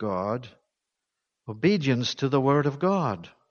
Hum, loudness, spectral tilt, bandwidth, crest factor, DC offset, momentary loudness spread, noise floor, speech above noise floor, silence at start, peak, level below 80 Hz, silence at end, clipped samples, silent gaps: none; -25 LUFS; -6.5 dB/octave; 7 kHz; 18 dB; under 0.1%; 14 LU; -84 dBFS; 59 dB; 0 s; -10 dBFS; -64 dBFS; 0.25 s; under 0.1%; none